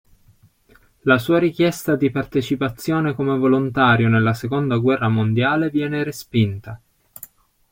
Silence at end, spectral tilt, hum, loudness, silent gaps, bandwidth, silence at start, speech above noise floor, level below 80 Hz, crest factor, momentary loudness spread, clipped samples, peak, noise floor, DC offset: 0.95 s; -7 dB/octave; none; -19 LUFS; none; 16.5 kHz; 1.05 s; 36 dB; -52 dBFS; 18 dB; 9 LU; under 0.1%; -2 dBFS; -55 dBFS; under 0.1%